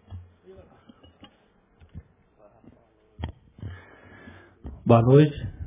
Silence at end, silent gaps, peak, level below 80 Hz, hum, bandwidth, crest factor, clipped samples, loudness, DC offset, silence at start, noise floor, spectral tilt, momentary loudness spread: 0 s; none; -2 dBFS; -48 dBFS; none; 3.8 kHz; 24 dB; under 0.1%; -19 LUFS; under 0.1%; 0.1 s; -62 dBFS; -12.5 dB/octave; 29 LU